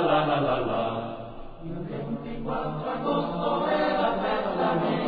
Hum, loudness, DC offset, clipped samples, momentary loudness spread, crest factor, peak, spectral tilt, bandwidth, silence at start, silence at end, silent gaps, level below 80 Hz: none; -27 LUFS; under 0.1%; under 0.1%; 12 LU; 16 dB; -12 dBFS; -9.5 dB/octave; 5 kHz; 0 s; 0 s; none; -46 dBFS